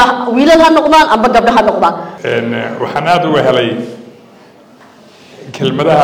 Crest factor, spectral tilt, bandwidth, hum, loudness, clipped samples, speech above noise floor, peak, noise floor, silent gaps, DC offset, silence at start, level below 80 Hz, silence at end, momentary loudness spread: 12 dB; -5.5 dB/octave; 19 kHz; none; -10 LUFS; under 0.1%; 30 dB; 0 dBFS; -40 dBFS; none; under 0.1%; 0 s; -42 dBFS; 0 s; 11 LU